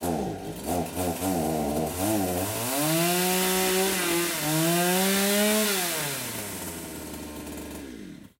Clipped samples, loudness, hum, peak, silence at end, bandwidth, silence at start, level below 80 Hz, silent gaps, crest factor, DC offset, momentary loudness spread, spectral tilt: under 0.1%; -25 LUFS; none; -12 dBFS; 0.1 s; 16.5 kHz; 0 s; -52 dBFS; none; 16 dB; under 0.1%; 15 LU; -3.5 dB/octave